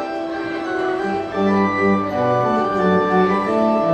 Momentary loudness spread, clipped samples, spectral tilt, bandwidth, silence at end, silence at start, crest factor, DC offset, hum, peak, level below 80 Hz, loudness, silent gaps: 7 LU; under 0.1%; -7.5 dB/octave; 8.8 kHz; 0 s; 0 s; 14 dB; under 0.1%; none; -4 dBFS; -52 dBFS; -18 LUFS; none